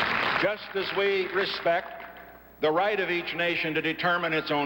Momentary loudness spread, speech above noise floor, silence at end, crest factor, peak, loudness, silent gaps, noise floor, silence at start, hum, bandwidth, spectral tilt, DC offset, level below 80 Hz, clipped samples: 6 LU; 21 dB; 0 s; 16 dB; -12 dBFS; -26 LUFS; none; -48 dBFS; 0 s; none; 16 kHz; -5.5 dB/octave; under 0.1%; -60 dBFS; under 0.1%